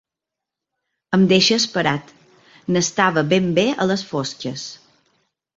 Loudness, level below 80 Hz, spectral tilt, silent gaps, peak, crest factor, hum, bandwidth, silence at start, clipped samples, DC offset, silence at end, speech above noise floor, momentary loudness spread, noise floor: -18 LUFS; -58 dBFS; -4.5 dB/octave; none; -2 dBFS; 20 dB; none; 7.8 kHz; 1.1 s; under 0.1%; under 0.1%; 0.8 s; 67 dB; 14 LU; -85 dBFS